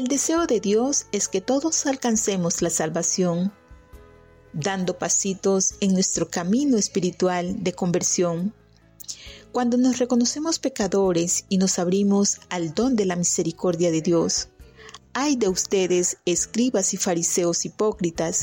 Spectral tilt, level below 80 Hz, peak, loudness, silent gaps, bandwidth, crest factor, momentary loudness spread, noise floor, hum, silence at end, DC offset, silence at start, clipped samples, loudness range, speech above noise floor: -4 dB/octave; -54 dBFS; -12 dBFS; -22 LUFS; none; 16.5 kHz; 12 dB; 6 LU; -50 dBFS; none; 0 s; under 0.1%; 0 s; under 0.1%; 2 LU; 28 dB